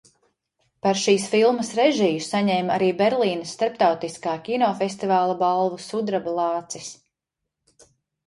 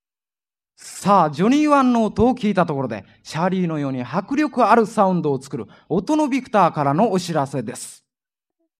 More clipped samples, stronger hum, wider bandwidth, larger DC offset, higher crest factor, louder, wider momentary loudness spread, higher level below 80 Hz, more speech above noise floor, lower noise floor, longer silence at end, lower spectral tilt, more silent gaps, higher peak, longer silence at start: neither; neither; second, 11.5 kHz vs 14.5 kHz; neither; about the same, 18 dB vs 18 dB; second, -22 LUFS vs -19 LUFS; second, 9 LU vs 15 LU; second, -68 dBFS vs -52 dBFS; second, 62 dB vs over 71 dB; second, -83 dBFS vs under -90 dBFS; first, 1.35 s vs 0.85 s; second, -4.5 dB/octave vs -6.5 dB/octave; neither; about the same, -4 dBFS vs -2 dBFS; about the same, 0.85 s vs 0.85 s